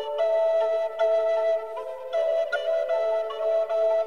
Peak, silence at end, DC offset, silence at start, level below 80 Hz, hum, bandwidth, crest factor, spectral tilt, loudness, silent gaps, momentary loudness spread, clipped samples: -14 dBFS; 0 s; 0.3%; 0 s; -72 dBFS; none; 7 kHz; 10 dB; -1.5 dB/octave; -25 LUFS; none; 5 LU; under 0.1%